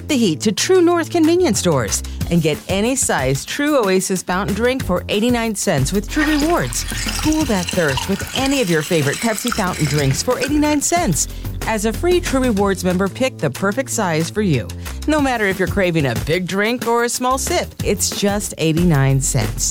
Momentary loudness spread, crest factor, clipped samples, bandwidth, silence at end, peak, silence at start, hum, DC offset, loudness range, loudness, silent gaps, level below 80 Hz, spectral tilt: 5 LU; 12 dB; under 0.1%; 17 kHz; 0 s; -4 dBFS; 0 s; none; under 0.1%; 2 LU; -17 LUFS; none; -32 dBFS; -4.5 dB/octave